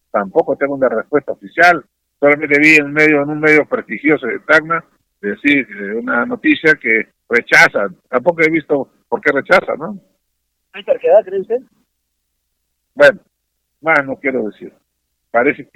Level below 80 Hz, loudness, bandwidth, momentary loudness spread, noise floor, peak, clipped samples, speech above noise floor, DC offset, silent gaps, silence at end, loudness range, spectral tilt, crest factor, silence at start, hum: -56 dBFS; -14 LUFS; 15.5 kHz; 13 LU; -71 dBFS; 0 dBFS; under 0.1%; 57 dB; under 0.1%; none; 0.15 s; 6 LU; -5 dB/octave; 16 dB; 0.15 s; none